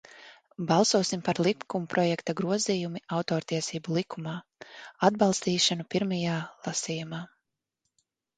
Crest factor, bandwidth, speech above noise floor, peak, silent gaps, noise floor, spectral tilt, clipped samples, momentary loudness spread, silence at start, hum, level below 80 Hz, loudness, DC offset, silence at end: 22 dB; 9.6 kHz; 54 dB; -6 dBFS; none; -82 dBFS; -4.5 dB/octave; under 0.1%; 14 LU; 0.15 s; none; -70 dBFS; -28 LUFS; under 0.1%; 1.1 s